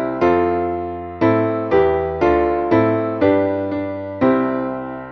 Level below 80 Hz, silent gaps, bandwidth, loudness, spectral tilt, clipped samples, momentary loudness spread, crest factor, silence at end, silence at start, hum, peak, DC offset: -42 dBFS; none; 6.2 kHz; -18 LUFS; -9 dB/octave; under 0.1%; 8 LU; 14 dB; 0 s; 0 s; none; -4 dBFS; under 0.1%